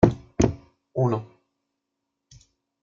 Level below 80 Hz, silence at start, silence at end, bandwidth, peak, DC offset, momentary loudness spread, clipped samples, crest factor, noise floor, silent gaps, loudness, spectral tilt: -44 dBFS; 0 s; 1.6 s; 7.6 kHz; -2 dBFS; under 0.1%; 11 LU; under 0.1%; 24 dB; -82 dBFS; none; -25 LUFS; -7.5 dB/octave